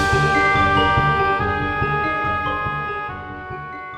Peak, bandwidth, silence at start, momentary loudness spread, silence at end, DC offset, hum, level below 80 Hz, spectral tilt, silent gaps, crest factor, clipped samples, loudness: -4 dBFS; 13.5 kHz; 0 s; 15 LU; 0 s; under 0.1%; none; -36 dBFS; -5.5 dB/octave; none; 16 dB; under 0.1%; -18 LUFS